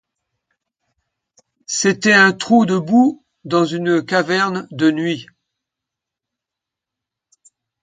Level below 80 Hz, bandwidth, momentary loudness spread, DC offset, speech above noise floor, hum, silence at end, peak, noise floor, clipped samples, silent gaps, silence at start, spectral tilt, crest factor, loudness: -66 dBFS; 9.4 kHz; 11 LU; under 0.1%; 69 dB; none; 2.6 s; 0 dBFS; -85 dBFS; under 0.1%; none; 1.7 s; -4.5 dB/octave; 20 dB; -16 LUFS